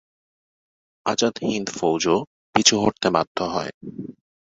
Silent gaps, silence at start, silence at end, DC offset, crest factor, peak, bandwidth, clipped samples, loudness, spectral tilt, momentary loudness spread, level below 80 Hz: 2.27-2.53 s, 3.27-3.35 s, 3.74-3.81 s; 1.05 s; 0.3 s; under 0.1%; 22 dB; 0 dBFS; 8.2 kHz; under 0.1%; -21 LUFS; -3 dB/octave; 18 LU; -56 dBFS